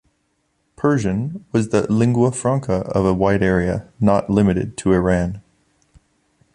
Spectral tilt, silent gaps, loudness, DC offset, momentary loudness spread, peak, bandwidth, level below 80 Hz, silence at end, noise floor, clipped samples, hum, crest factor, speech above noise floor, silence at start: -7.5 dB/octave; none; -19 LUFS; under 0.1%; 6 LU; -2 dBFS; 11 kHz; -40 dBFS; 1.15 s; -67 dBFS; under 0.1%; none; 16 dB; 50 dB; 0.8 s